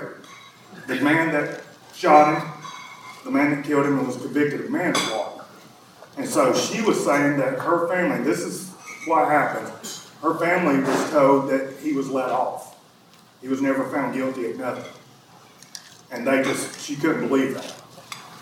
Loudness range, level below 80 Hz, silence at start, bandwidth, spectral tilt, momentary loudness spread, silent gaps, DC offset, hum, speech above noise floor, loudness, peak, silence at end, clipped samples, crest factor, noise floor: 6 LU; -72 dBFS; 0 s; 16.5 kHz; -4.5 dB/octave; 19 LU; none; under 0.1%; none; 31 dB; -22 LUFS; -2 dBFS; 0 s; under 0.1%; 22 dB; -52 dBFS